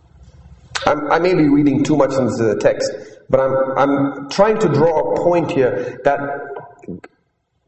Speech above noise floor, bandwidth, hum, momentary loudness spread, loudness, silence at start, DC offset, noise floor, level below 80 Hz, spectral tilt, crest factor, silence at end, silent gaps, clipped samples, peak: 51 dB; 8.6 kHz; none; 16 LU; -16 LUFS; 0.5 s; under 0.1%; -66 dBFS; -48 dBFS; -6.5 dB/octave; 16 dB; 0.7 s; none; under 0.1%; 0 dBFS